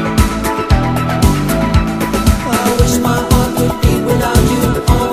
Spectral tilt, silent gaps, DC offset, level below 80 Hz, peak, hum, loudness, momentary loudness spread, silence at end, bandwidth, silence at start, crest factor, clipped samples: -5.5 dB/octave; none; under 0.1%; -18 dBFS; 0 dBFS; none; -13 LUFS; 2 LU; 0 s; 16 kHz; 0 s; 12 dB; 0.4%